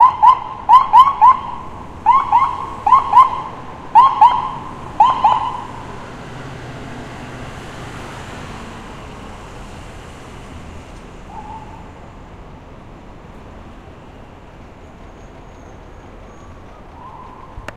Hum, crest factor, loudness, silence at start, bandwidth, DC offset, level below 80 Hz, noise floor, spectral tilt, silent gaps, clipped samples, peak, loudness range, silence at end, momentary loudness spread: none; 18 dB; -12 LUFS; 0 s; 11 kHz; under 0.1%; -40 dBFS; -38 dBFS; -5 dB/octave; none; under 0.1%; 0 dBFS; 26 LU; 0.05 s; 26 LU